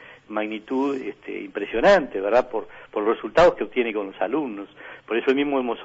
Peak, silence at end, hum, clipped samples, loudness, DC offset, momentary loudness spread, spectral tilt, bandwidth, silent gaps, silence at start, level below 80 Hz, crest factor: -8 dBFS; 0 s; none; under 0.1%; -23 LUFS; under 0.1%; 15 LU; -5.5 dB/octave; 8 kHz; none; 0 s; -50 dBFS; 16 dB